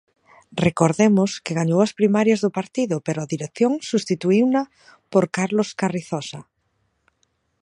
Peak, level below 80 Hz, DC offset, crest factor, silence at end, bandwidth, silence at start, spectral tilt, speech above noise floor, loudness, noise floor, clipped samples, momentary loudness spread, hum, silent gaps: -2 dBFS; -60 dBFS; under 0.1%; 20 dB; 1.2 s; 11 kHz; 0.5 s; -6 dB/octave; 49 dB; -21 LUFS; -70 dBFS; under 0.1%; 11 LU; none; none